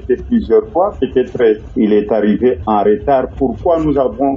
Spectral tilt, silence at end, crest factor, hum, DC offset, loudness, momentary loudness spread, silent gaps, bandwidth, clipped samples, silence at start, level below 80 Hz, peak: -9 dB/octave; 0 s; 12 dB; none; under 0.1%; -14 LUFS; 4 LU; none; 6.8 kHz; under 0.1%; 0 s; -34 dBFS; -2 dBFS